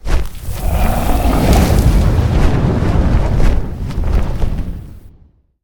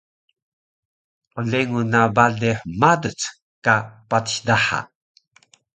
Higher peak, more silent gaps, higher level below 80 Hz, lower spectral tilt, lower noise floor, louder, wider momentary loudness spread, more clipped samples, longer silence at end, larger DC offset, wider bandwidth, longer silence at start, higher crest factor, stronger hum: about the same, 0 dBFS vs 0 dBFS; second, none vs 3.42-3.62 s; first, -16 dBFS vs -54 dBFS; first, -6.5 dB/octave vs -4.5 dB/octave; second, -47 dBFS vs -57 dBFS; first, -16 LUFS vs -20 LUFS; about the same, 11 LU vs 11 LU; neither; second, 0.55 s vs 0.9 s; neither; first, 19.5 kHz vs 9.4 kHz; second, 0.05 s vs 1.35 s; second, 12 dB vs 22 dB; neither